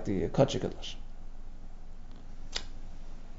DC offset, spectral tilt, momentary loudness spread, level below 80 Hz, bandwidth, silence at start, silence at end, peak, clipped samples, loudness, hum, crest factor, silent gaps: under 0.1%; -5.5 dB/octave; 24 LU; -40 dBFS; 7.6 kHz; 0 s; 0 s; -10 dBFS; under 0.1%; -33 LUFS; none; 24 dB; none